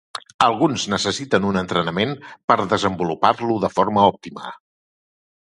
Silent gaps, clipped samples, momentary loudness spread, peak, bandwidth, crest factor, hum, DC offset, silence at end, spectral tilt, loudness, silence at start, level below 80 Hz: 0.34-0.39 s, 2.44-2.48 s; under 0.1%; 14 LU; 0 dBFS; 11.5 kHz; 20 dB; none; under 0.1%; 0.9 s; -5 dB/octave; -19 LUFS; 0.15 s; -52 dBFS